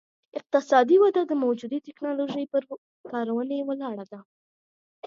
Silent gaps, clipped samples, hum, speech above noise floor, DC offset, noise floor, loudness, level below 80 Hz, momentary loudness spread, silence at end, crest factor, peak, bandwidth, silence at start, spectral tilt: 2.78-3.04 s, 4.25-5.02 s; under 0.1%; none; over 65 dB; under 0.1%; under -90 dBFS; -25 LUFS; -82 dBFS; 20 LU; 0 s; 20 dB; -6 dBFS; 7.4 kHz; 0.35 s; -5.5 dB/octave